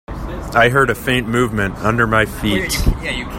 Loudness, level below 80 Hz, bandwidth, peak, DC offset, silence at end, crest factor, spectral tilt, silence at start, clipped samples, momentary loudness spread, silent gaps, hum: -16 LUFS; -26 dBFS; 16.5 kHz; 0 dBFS; under 0.1%; 0 s; 16 dB; -5 dB/octave; 0.1 s; under 0.1%; 7 LU; none; none